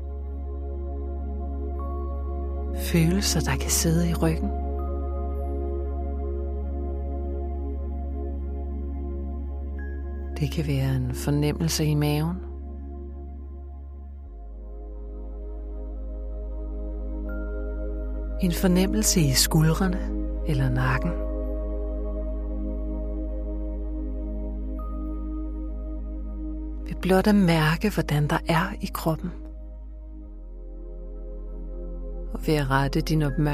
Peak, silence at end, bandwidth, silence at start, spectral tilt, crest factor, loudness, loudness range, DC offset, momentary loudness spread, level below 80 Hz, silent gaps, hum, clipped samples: -6 dBFS; 0 s; 15.5 kHz; 0 s; -5 dB/octave; 20 dB; -27 LUFS; 12 LU; under 0.1%; 18 LU; -30 dBFS; none; none; under 0.1%